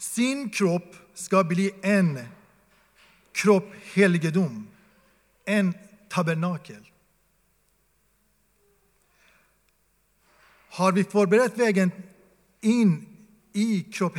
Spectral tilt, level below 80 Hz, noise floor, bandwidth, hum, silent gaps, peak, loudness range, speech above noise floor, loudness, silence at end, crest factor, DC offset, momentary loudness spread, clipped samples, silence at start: -6 dB/octave; -72 dBFS; -68 dBFS; 16 kHz; none; none; -6 dBFS; 8 LU; 45 dB; -24 LUFS; 0 s; 20 dB; under 0.1%; 17 LU; under 0.1%; 0 s